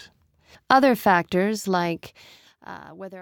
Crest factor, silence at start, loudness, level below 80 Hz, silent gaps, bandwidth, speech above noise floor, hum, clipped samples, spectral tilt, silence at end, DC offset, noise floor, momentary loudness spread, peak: 20 dB; 0.7 s; -21 LUFS; -62 dBFS; none; 19 kHz; 34 dB; none; under 0.1%; -5.5 dB/octave; 0 s; under 0.1%; -56 dBFS; 22 LU; -4 dBFS